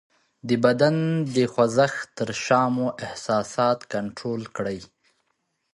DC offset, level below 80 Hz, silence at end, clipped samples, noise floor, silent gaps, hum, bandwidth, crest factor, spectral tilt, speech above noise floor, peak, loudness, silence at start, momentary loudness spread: under 0.1%; -62 dBFS; 0.9 s; under 0.1%; -74 dBFS; none; none; 11.5 kHz; 20 dB; -5.5 dB/octave; 51 dB; -4 dBFS; -24 LUFS; 0.45 s; 10 LU